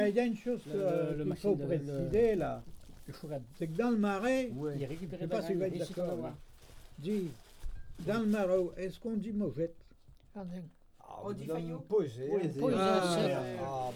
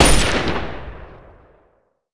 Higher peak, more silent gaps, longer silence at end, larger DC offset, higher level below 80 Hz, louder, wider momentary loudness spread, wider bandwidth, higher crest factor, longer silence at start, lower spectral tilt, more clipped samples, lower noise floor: second, -16 dBFS vs 0 dBFS; neither; second, 0 s vs 0.95 s; neither; second, -54 dBFS vs -26 dBFS; second, -34 LUFS vs -19 LUFS; second, 16 LU vs 25 LU; first, 18.5 kHz vs 11 kHz; about the same, 18 dB vs 18 dB; about the same, 0 s vs 0 s; first, -6.5 dB/octave vs -3.5 dB/octave; neither; about the same, -58 dBFS vs -61 dBFS